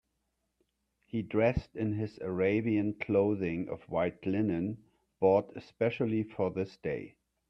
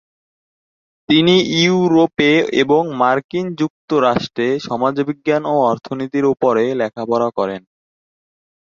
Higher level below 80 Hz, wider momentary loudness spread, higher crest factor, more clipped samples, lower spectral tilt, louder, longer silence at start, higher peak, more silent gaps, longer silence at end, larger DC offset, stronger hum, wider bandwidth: about the same, -56 dBFS vs -58 dBFS; about the same, 10 LU vs 9 LU; about the same, 20 dB vs 16 dB; neither; first, -9.5 dB/octave vs -5.5 dB/octave; second, -32 LUFS vs -16 LUFS; about the same, 1.15 s vs 1.1 s; second, -12 dBFS vs -2 dBFS; second, none vs 3.24-3.29 s, 3.70-3.88 s; second, 0.4 s vs 1.1 s; neither; neither; second, 6.2 kHz vs 7.4 kHz